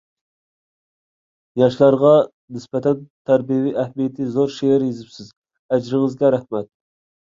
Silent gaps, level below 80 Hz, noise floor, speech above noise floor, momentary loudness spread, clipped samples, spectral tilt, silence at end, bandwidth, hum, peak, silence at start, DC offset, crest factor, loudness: 2.33-2.48 s, 3.10-3.25 s, 5.37-5.42 s, 5.59-5.69 s; -62 dBFS; under -90 dBFS; over 72 dB; 14 LU; under 0.1%; -8 dB/octave; 0.65 s; 7.6 kHz; none; -2 dBFS; 1.55 s; under 0.1%; 18 dB; -18 LUFS